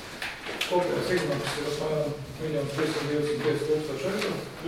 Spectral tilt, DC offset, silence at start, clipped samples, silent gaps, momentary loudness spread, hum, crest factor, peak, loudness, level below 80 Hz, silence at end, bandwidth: -5 dB/octave; under 0.1%; 0 s; under 0.1%; none; 6 LU; none; 18 dB; -12 dBFS; -29 LUFS; -54 dBFS; 0 s; 16.5 kHz